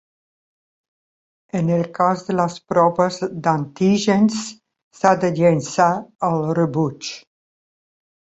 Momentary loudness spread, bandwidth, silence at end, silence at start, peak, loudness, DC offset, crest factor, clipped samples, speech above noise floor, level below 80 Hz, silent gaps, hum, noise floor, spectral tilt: 9 LU; 8.2 kHz; 1.1 s; 1.55 s; -2 dBFS; -19 LUFS; under 0.1%; 18 dB; under 0.1%; over 72 dB; -60 dBFS; 4.83-4.91 s, 6.15-6.19 s; none; under -90 dBFS; -6 dB/octave